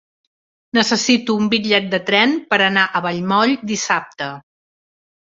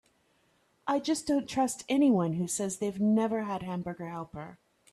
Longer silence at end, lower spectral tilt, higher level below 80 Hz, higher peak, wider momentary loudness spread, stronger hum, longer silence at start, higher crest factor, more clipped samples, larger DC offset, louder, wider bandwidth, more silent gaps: first, 0.8 s vs 0.4 s; second, -3.5 dB/octave vs -5.5 dB/octave; about the same, -62 dBFS vs -66 dBFS; first, 0 dBFS vs -16 dBFS; second, 6 LU vs 15 LU; neither; about the same, 0.75 s vs 0.85 s; about the same, 18 dB vs 14 dB; neither; neither; first, -16 LUFS vs -30 LUFS; second, 7.8 kHz vs 13.5 kHz; neither